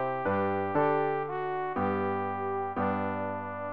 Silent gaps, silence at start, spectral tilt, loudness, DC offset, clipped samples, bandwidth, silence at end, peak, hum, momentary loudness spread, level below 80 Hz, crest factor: none; 0 s; -6 dB/octave; -30 LUFS; 0.3%; under 0.1%; 5 kHz; 0 s; -12 dBFS; none; 6 LU; -70 dBFS; 18 dB